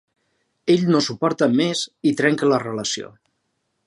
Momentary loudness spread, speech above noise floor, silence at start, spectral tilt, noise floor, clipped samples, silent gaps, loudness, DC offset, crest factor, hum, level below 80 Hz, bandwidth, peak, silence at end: 9 LU; 53 dB; 0.65 s; -5 dB/octave; -73 dBFS; under 0.1%; none; -20 LUFS; under 0.1%; 18 dB; none; -68 dBFS; 11.5 kHz; -4 dBFS; 0.8 s